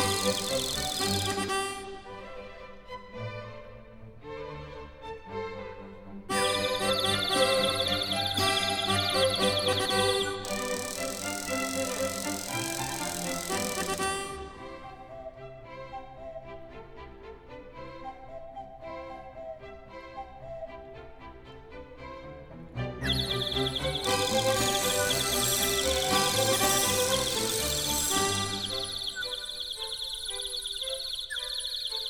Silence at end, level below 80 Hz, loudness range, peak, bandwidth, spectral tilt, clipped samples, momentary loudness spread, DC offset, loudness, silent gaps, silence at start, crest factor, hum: 0 s; -50 dBFS; 19 LU; -12 dBFS; 19 kHz; -2.5 dB/octave; under 0.1%; 21 LU; under 0.1%; -28 LUFS; none; 0 s; 20 dB; none